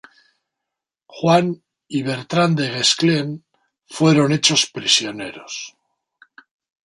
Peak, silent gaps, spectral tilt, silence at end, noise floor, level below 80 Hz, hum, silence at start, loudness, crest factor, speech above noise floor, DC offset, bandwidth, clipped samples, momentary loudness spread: 0 dBFS; none; -4 dB/octave; 1.2 s; -84 dBFS; -64 dBFS; none; 1.1 s; -18 LUFS; 20 dB; 65 dB; under 0.1%; 11.5 kHz; under 0.1%; 16 LU